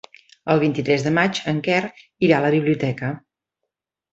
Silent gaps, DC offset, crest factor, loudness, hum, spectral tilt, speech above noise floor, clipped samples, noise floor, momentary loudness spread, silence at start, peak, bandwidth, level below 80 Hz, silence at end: none; under 0.1%; 20 dB; -20 LUFS; none; -6.5 dB/octave; 62 dB; under 0.1%; -82 dBFS; 12 LU; 0.45 s; -2 dBFS; 8 kHz; -60 dBFS; 0.95 s